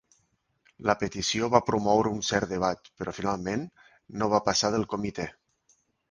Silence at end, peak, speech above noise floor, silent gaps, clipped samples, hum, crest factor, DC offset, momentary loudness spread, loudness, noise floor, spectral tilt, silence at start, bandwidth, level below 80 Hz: 0.8 s; -4 dBFS; 45 dB; none; under 0.1%; none; 26 dB; under 0.1%; 12 LU; -27 LUFS; -72 dBFS; -4 dB/octave; 0.8 s; 10.5 kHz; -56 dBFS